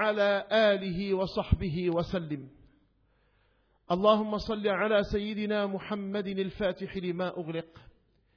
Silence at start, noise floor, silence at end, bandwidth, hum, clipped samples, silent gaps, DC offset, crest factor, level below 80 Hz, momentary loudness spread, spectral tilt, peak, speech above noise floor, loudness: 0 s; -69 dBFS; 0.55 s; 5.4 kHz; none; under 0.1%; none; under 0.1%; 20 dB; -46 dBFS; 10 LU; -4.5 dB/octave; -10 dBFS; 40 dB; -30 LUFS